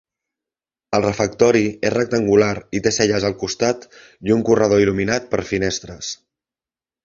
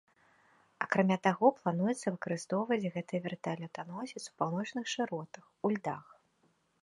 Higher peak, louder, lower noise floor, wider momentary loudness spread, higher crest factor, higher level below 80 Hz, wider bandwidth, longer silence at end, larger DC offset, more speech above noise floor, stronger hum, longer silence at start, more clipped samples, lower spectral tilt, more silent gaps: first, 0 dBFS vs -12 dBFS; first, -18 LUFS vs -34 LUFS; first, under -90 dBFS vs -73 dBFS; about the same, 12 LU vs 13 LU; about the same, 18 dB vs 22 dB; first, -48 dBFS vs -80 dBFS; second, 7.8 kHz vs 11.5 kHz; about the same, 0.9 s vs 0.85 s; neither; first, over 72 dB vs 40 dB; neither; about the same, 0.9 s vs 0.8 s; neither; about the same, -4.5 dB/octave vs -5.5 dB/octave; neither